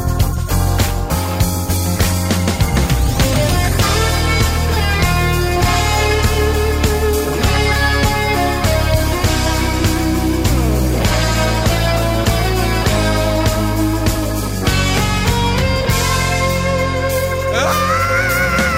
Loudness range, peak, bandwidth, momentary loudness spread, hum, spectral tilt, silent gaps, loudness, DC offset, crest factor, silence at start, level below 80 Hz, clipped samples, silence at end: 1 LU; 0 dBFS; 16.5 kHz; 3 LU; none; -4.5 dB/octave; none; -15 LUFS; under 0.1%; 14 dB; 0 s; -20 dBFS; under 0.1%; 0 s